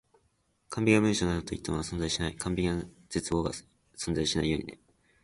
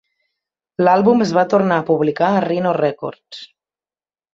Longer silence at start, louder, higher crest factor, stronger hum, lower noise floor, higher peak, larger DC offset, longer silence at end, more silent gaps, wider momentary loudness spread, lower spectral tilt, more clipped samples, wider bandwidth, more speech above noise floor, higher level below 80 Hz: about the same, 0.7 s vs 0.8 s; second, -30 LUFS vs -16 LUFS; first, 22 dB vs 16 dB; neither; second, -72 dBFS vs under -90 dBFS; second, -8 dBFS vs -2 dBFS; neither; second, 0.5 s vs 0.9 s; neither; second, 12 LU vs 19 LU; second, -5 dB/octave vs -7 dB/octave; neither; first, 11.5 kHz vs 7.6 kHz; second, 43 dB vs over 74 dB; first, -46 dBFS vs -60 dBFS